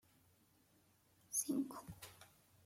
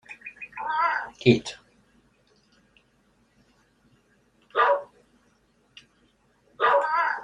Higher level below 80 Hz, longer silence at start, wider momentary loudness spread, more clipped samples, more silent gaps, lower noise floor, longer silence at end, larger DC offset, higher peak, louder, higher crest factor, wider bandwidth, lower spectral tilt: second, -78 dBFS vs -66 dBFS; first, 1.3 s vs 0.1 s; about the same, 18 LU vs 18 LU; neither; neither; first, -74 dBFS vs -65 dBFS; first, 0.4 s vs 0 s; neither; second, -26 dBFS vs -4 dBFS; second, -42 LUFS vs -24 LUFS; about the same, 24 dB vs 26 dB; first, 16.5 kHz vs 10.5 kHz; second, -3.5 dB/octave vs -6 dB/octave